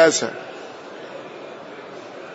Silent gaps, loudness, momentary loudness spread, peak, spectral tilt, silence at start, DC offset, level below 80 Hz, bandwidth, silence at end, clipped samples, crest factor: none; -28 LUFS; 14 LU; -4 dBFS; -2.5 dB/octave; 0 s; under 0.1%; -78 dBFS; 8 kHz; 0 s; under 0.1%; 20 dB